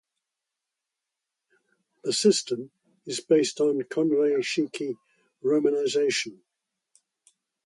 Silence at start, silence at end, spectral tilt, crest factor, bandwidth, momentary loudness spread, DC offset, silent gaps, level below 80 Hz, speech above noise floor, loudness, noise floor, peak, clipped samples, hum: 2.05 s; 1.3 s; -3.5 dB/octave; 20 dB; 11.5 kHz; 13 LU; under 0.1%; none; -76 dBFS; 62 dB; -25 LUFS; -86 dBFS; -8 dBFS; under 0.1%; none